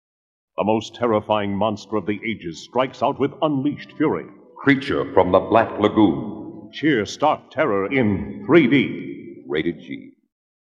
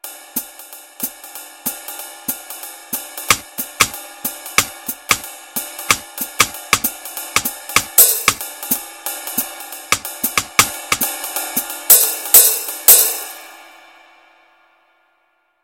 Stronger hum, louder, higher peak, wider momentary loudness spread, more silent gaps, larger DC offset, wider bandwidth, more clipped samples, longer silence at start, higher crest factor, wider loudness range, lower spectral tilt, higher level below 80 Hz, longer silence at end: neither; second, -21 LUFS vs -15 LUFS; about the same, 0 dBFS vs 0 dBFS; second, 15 LU vs 18 LU; neither; neither; second, 7.6 kHz vs 17 kHz; second, under 0.1% vs 0.2%; first, 0.6 s vs 0.05 s; about the same, 20 dB vs 20 dB; second, 4 LU vs 9 LU; first, -6.5 dB/octave vs 0 dB/octave; about the same, -54 dBFS vs -50 dBFS; second, 0.65 s vs 2 s